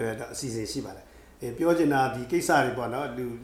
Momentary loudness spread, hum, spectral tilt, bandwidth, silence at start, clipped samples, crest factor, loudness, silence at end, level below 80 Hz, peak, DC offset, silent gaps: 13 LU; none; -5 dB/octave; 15.5 kHz; 0 s; under 0.1%; 20 dB; -27 LUFS; 0 s; -54 dBFS; -8 dBFS; under 0.1%; none